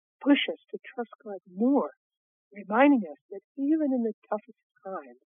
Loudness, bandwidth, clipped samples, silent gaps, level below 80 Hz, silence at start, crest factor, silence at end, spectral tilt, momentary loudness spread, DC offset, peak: -27 LUFS; 3.7 kHz; under 0.1%; 1.97-2.10 s, 2.17-2.51 s, 3.21-3.29 s, 3.44-3.55 s, 4.13-4.22 s, 4.63-4.70 s; under -90 dBFS; 0.2 s; 20 dB; 0.25 s; -3 dB/octave; 19 LU; under 0.1%; -10 dBFS